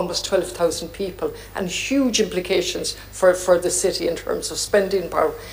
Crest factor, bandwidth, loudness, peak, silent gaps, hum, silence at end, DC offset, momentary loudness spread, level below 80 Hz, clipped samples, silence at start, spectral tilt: 18 dB; 15.5 kHz; -21 LUFS; -4 dBFS; none; none; 0 s; under 0.1%; 9 LU; -44 dBFS; under 0.1%; 0 s; -3 dB/octave